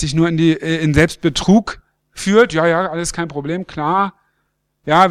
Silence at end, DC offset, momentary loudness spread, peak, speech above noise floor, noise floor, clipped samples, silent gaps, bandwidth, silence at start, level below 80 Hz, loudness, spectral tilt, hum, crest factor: 0 s; under 0.1%; 10 LU; 0 dBFS; 52 dB; -68 dBFS; under 0.1%; none; 13.5 kHz; 0 s; -38 dBFS; -16 LUFS; -5.5 dB/octave; none; 16 dB